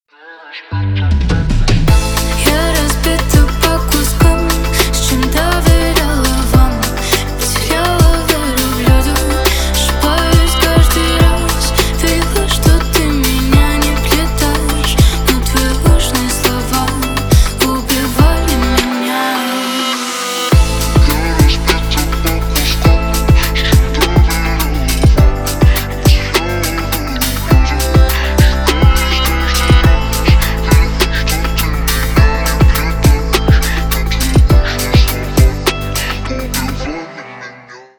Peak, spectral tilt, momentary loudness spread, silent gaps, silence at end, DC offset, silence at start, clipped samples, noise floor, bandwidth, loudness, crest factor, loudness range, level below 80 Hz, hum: 0 dBFS; -4.5 dB/octave; 5 LU; none; 0.2 s; under 0.1%; 0.25 s; under 0.1%; -37 dBFS; over 20 kHz; -13 LUFS; 12 dB; 2 LU; -14 dBFS; none